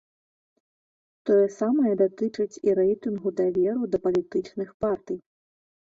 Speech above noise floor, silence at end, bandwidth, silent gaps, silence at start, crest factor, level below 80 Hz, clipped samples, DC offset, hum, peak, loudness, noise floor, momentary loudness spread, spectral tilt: over 66 dB; 0.75 s; 7.6 kHz; 4.74-4.80 s; 1.25 s; 14 dB; -62 dBFS; under 0.1%; under 0.1%; none; -12 dBFS; -25 LUFS; under -90 dBFS; 9 LU; -7.5 dB/octave